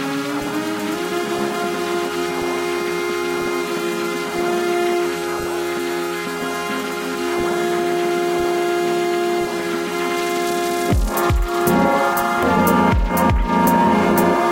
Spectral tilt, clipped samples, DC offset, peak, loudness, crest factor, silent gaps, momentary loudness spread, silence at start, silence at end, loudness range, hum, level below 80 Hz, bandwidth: -5 dB/octave; under 0.1%; under 0.1%; -2 dBFS; -19 LUFS; 16 dB; none; 7 LU; 0 s; 0 s; 5 LU; none; -30 dBFS; 16.5 kHz